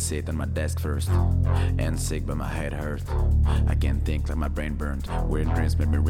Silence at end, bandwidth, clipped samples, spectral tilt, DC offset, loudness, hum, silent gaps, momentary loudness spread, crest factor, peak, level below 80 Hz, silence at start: 0 s; 14.5 kHz; under 0.1%; -6 dB/octave; under 0.1%; -26 LUFS; none; none; 6 LU; 12 dB; -10 dBFS; -28 dBFS; 0 s